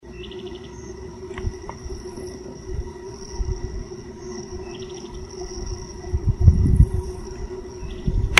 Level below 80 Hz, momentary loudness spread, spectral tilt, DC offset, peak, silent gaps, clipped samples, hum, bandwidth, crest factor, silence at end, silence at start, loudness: -28 dBFS; 18 LU; -5 dB/octave; under 0.1%; 0 dBFS; none; under 0.1%; none; 11 kHz; 24 dB; 0 s; 0.05 s; -27 LUFS